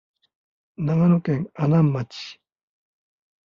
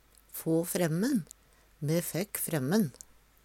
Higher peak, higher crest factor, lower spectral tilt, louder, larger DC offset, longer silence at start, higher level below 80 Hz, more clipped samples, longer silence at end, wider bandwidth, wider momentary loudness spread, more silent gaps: first, -8 dBFS vs -14 dBFS; about the same, 16 dB vs 18 dB; first, -9 dB/octave vs -5.5 dB/octave; first, -21 LUFS vs -31 LUFS; neither; first, 0.8 s vs 0.35 s; first, -60 dBFS vs -66 dBFS; neither; first, 1.1 s vs 0.55 s; second, 7 kHz vs 18.5 kHz; first, 16 LU vs 10 LU; neither